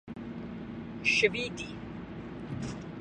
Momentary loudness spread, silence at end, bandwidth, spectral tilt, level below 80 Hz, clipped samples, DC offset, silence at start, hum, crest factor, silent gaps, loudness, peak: 17 LU; 0 s; 10 kHz; -4 dB/octave; -56 dBFS; under 0.1%; under 0.1%; 0.05 s; none; 24 dB; none; -33 LUFS; -10 dBFS